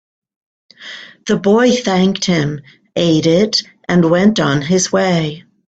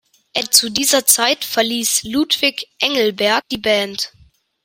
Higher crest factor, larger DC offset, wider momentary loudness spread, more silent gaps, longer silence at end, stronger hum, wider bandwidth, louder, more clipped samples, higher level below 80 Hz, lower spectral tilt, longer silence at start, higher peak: about the same, 14 dB vs 18 dB; neither; first, 17 LU vs 10 LU; neither; second, 0.3 s vs 0.55 s; neither; second, 8.4 kHz vs 16.5 kHz; about the same, -14 LUFS vs -15 LUFS; neither; first, -50 dBFS vs -56 dBFS; first, -5 dB/octave vs -0.5 dB/octave; first, 0.8 s vs 0.35 s; about the same, 0 dBFS vs 0 dBFS